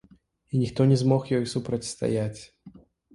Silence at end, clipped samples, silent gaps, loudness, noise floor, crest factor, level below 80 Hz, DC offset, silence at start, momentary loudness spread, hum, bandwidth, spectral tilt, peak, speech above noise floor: 0.45 s; under 0.1%; none; -26 LUFS; -51 dBFS; 18 dB; -56 dBFS; under 0.1%; 0.55 s; 10 LU; none; 11.5 kHz; -7 dB/octave; -8 dBFS; 27 dB